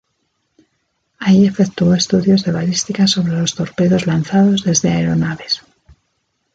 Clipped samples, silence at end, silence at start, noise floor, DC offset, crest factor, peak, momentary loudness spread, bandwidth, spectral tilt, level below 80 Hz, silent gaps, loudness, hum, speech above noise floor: under 0.1%; 0.95 s; 1.2 s; -68 dBFS; under 0.1%; 14 dB; -2 dBFS; 7 LU; 9 kHz; -5 dB/octave; -48 dBFS; none; -15 LUFS; none; 54 dB